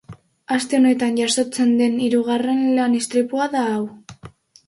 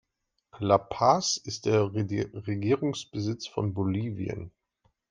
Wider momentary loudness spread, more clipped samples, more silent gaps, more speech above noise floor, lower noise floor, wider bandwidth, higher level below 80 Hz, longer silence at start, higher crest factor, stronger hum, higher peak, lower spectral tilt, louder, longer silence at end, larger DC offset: second, 7 LU vs 11 LU; neither; neither; second, 26 dB vs 51 dB; second, -44 dBFS vs -79 dBFS; first, 11.5 kHz vs 9.8 kHz; about the same, -62 dBFS vs -62 dBFS; second, 0.1 s vs 0.55 s; second, 14 dB vs 22 dB; neither; about the same, -6 dBFS vs -6 dBFS; second, -4 dB/octave vs -5.5 dB/octave; first, -19 LUFS vs -28 LUFS; second, 0.4 s vs 0.6 s; neither